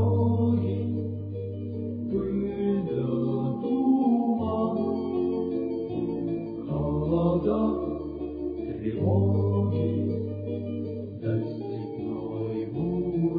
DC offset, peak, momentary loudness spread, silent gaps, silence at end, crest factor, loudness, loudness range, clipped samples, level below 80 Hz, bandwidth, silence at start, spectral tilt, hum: under 0.1%; -12 dBFS; 9 LU; none; 0 s; 14 dB; -28 LUFS; 3 LU; under 0.1%; -50 dBFS; 4.9 kHz; 0 s; -13 dB/octave; none